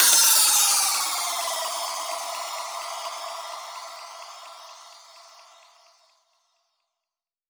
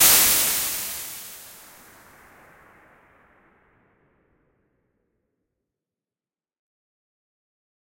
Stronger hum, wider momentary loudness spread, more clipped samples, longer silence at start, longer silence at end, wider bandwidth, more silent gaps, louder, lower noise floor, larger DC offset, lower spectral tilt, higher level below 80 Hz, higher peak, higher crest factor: neither; second, 25 LU vs 28 LU; neither; about the same, 0 s vs 0 s; second, 2.3 s vs 6.4 s; first, over 20 kHz vs 16.5 kHz; neither; about the same, -21 LUFS vs -19 LUFS; about the same, -90 dBFS vs under -90 dBFS; neither; second, 4 dB/octave vs 1 dB/octave; second, under -90 dBFS vs -58 dBFS; about the same, -4 dBFS vs -2 dBFS; about the same, 22 dB vs 26 dB